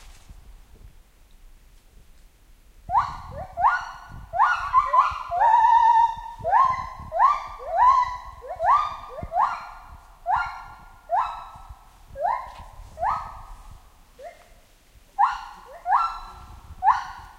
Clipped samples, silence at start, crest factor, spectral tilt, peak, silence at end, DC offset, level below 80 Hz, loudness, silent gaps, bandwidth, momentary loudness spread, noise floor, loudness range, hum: under 0.1%; 0.05 s; 18 dB; -3.5 dB/octave; -6 dBFS; 0.1 s; under 0.1%; -46 dBFS; -22 LUFS; none; 13 kHz; 23 LU; -54 dBFS; 13 LU; none